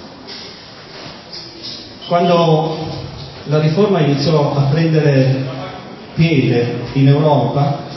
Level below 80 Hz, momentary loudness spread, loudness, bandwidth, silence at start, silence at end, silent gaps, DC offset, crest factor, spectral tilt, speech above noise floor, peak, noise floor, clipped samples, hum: -46 dBFS; 18 LU; -14 LUFS; 6 kHz; 0 s; 0 s; none; under 0.1%; 14 dB; -8 dB/octave; 22 dB; 0 dBFS; -35 dBFS; under 0.1%; none